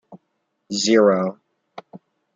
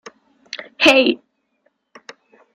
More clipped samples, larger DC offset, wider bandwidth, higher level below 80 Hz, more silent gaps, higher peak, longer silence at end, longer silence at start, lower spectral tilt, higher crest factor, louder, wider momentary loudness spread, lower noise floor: neither; neither; second, 9.4 kHz vs 13.5 kHz; second, -72 dBFS vs -64 dBFS; neither; second, -4 dBFS vs 0 dBFS; second, 0.4 s vs 1.4 s; second, 0.1 s vs 0.55 s; first, -4.5 dB/octave vs -2.5 dB/octave; about the same, 18 dB vs 20 dB; second, -19 LUFS vs -14 LUFS; first, 26 LU vs 21 LU; first, -73 dBFS vs -66 dBFS